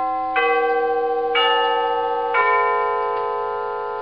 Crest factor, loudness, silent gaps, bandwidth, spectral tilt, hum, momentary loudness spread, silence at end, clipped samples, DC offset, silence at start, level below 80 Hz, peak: 16 dB; -20 LUFS; none; 5.4 kHz; 2 dB/octave; none; 7 LU; 0 s; under 0.1%; 0.3%; 0 s; -60 dBFS; -4 dBFS